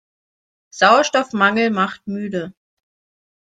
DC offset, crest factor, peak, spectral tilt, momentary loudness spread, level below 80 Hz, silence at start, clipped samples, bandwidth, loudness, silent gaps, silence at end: under 0.1%; 20 dB; 0 dBFS; -4 dB/octave; 14 LU; -66 dBFS; 0.75 s; under 0.1%; 9.2 kHz; -17 LUFS; none; 0.95 s